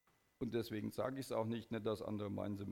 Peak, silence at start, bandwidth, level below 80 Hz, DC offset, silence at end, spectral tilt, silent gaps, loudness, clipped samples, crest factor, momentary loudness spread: -24 dBFS; 0.4 s; 17 kHz; -72 dBFS; under 0.1%; 0 s; -6.5 dB/octave; none; -43 LUFS; under 0.1%; 18 dB; 3 LU